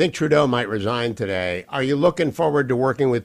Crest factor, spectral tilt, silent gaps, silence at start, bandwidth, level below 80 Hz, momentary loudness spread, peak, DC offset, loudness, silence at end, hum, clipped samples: 14 dB; -6 dB/octave; none; 0 s; 14 kHz; -54 dBFS; 6 LU; -6 dBFS; under 0.1%; -21 LUFS; 0 s; none; under 0.1%